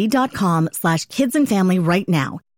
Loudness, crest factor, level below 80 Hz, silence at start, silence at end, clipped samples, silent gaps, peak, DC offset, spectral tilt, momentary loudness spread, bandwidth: -18 LUFS; 12 dB; -56 dBFS; 0 s; 0.2 s; under 0.1%; none; -6 dBFS; under 0.1%; -6 dB/octave; 4 LU; 17 kHz